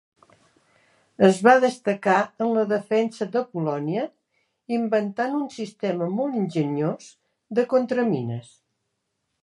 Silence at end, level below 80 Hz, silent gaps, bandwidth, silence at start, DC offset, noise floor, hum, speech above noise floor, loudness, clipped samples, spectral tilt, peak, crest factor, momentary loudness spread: 1 s; -72 dBFS; none; 11.5 kHz; 1.2 s; under 0.1%; -77 dBFS; none; 55 dB; -23 LUFS; under 0.1%; -6.5 dB/octave; -2 dBFS; 22 dB; 11 LU